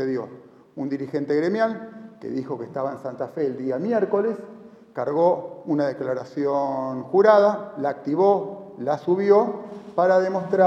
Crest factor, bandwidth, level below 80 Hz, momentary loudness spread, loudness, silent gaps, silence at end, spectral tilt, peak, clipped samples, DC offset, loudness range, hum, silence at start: 20 dB; 7.6 kHz; -72 dBFS; 15 LU; -23 LUFS; none; 0 s; -8 dB/octave; -2 dBFS; under 0.1%; under 0.1%; 7 LU; none; 0 s